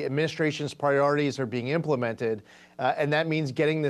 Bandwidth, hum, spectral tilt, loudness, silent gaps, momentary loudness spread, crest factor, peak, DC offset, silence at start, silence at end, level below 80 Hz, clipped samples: 12 kHz; none; -6.5 dB/octave; -27 LUFS; none; 7 LU; 16 dB; -10 dBFS; under 0.1%; 0 s; 0 s; -70 dBFS; under 0.1%